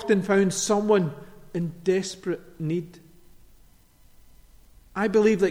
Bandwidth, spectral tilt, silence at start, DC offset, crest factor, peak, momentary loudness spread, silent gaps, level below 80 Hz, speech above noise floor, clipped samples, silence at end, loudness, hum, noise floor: 16 kHz; -5.5 dB/octave; 0 s; under 0.1%; 18 dB; -8 dBFS; 13 LU; none; -56 dBFS; 31 dB; under 0.1%; 0 s; -25 LUFS; none; -55 dBFS